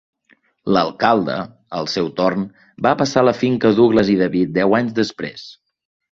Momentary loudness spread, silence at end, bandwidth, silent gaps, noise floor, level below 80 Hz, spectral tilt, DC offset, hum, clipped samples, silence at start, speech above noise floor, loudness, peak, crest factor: 14 LU; 0.6 s; 7.6 kHz; none; -58 dBFS; -52 dBFS; -6 dB/octave; under 0.1%; none; under 0.1%; 0.65 s; 41 dB; -17 LUFS; -2 dBFS; 16 dB